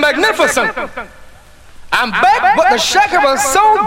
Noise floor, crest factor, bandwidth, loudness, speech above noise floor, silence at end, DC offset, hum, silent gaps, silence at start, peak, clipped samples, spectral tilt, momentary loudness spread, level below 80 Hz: -38 dBFS; 12 dB; 16.5 kHz; -11 LUFS; 26 dB; 0 s; under 0.1%; none; none; 0 s; 0 dBFS; under 0.1%; -1.5 dB/octave; 9 LU; -42 dBFS